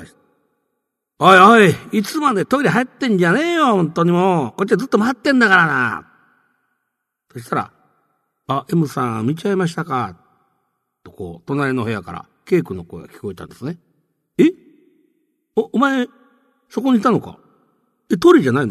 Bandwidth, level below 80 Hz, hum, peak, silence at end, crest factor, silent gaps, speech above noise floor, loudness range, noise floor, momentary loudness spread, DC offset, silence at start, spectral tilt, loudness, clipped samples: 13.5 kHz; -58 dBFS; none; 0 dBFS; 0 s; 18 dB; none; 60 dB; 10 LU; -76 dBFS; 19 LU; under 0.1%; 0 s; -6 dB/octave; -16 LUFS; under 0.1%